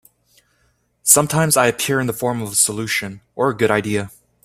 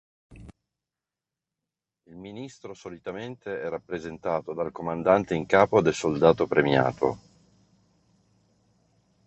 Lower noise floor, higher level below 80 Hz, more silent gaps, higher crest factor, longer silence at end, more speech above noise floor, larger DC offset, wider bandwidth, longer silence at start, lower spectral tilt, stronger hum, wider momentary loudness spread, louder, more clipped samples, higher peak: second, -63 dBFS vs -89 dBFS; about the same, -54 dBFS vs -58 dBFS; neither; about the same, 20 dB vs 24 dB; second, 0.35 s vs 2.1 s; second, 44 dB vs 64 dB; neither; first, 16 kHz vs 8.4 kHz; first, 1.05 s vs 0.3 s; second, -3 dB/octave vs -6 dB/octave; first, 60 Hz at -45 dBFS vs none; second, 11 LU vs 20 LU; first, -17 LUFS vs -25 LUFS; neither; first, 0 dBFS vs -4 dBFS